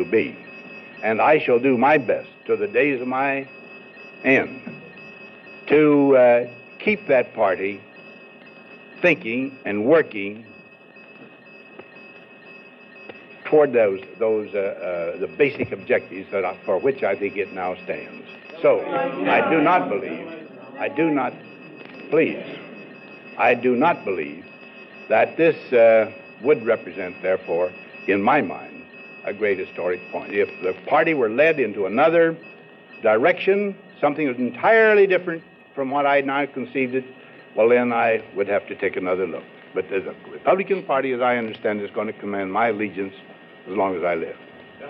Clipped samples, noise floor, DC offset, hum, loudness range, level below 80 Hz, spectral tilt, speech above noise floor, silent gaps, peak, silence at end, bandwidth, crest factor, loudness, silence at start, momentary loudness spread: under 0.1%; -46 dBFS; under 0.1%; none; 5 LU; -72 dBFS; -8 dB/octave; 26 dB; none; -6 dBFS; 0 s; 6 kHz; 16 dB; -21 LUFS; 0 s; 21 LU